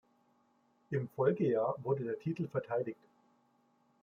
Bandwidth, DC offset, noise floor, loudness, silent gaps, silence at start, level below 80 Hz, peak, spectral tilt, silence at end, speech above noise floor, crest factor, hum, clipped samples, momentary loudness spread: 6.6 kHz; under 0.1%; -73 dBFS; -35 LUFS; none; 0.9 s; -80 dBFS; -18 dBFS; -10 dB/octave; 1.1 s; 38 dB; 20 dB; none; under 0.1%; 8 LU